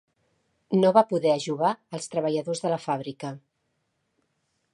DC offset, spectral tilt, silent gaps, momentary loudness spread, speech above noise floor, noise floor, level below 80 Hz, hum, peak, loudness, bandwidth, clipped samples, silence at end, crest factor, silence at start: under 0.1%; -6 dB/octave; none; 16 LU; 51 dB; -76 dBFS; -76 dBFS; none; -4 dBFS; -25 LUFS; 11.5 kHz; under 0.1%; 1.35 s; 22 dB; 0.7 s